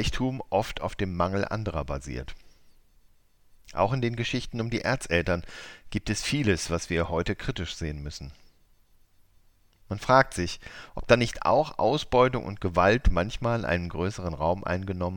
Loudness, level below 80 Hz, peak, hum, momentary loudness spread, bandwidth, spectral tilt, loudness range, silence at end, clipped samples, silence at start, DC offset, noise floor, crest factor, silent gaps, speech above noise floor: -27 LUFS; -40 dBFS; -4 dBFS; none; 15 LU; 18 kHz; -5.5 dB/octave; 7 LU; 0 s; under 0.1%; 0 s; under 0.1%; -60 dBFS; 24 dB; none; 33 dB